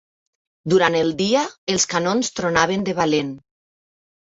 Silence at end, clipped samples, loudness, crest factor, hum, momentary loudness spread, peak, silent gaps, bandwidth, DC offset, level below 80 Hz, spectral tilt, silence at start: 0.85 s; under 0.1%; -19 LUFS; 20 dB; none; 6 LU; -2 dBFS; 1.58-1.67 s; 8 kHz; under 0.1%; -54 dBFS; -3.5 dB/octave; 0.65 s